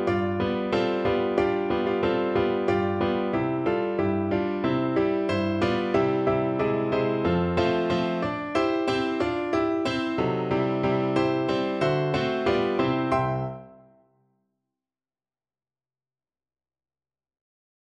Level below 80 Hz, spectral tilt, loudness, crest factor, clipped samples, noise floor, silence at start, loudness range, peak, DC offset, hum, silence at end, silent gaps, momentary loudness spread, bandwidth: -52 dBFS; -7.5 dB/octave; -25 LUFS; 18 dB; under 0.1%; under -90 dBFS; 0 s; 4 LU; -8 dBFS; under 0.1%; none; 4.1 s; none; 2 LU; 9.2 kHz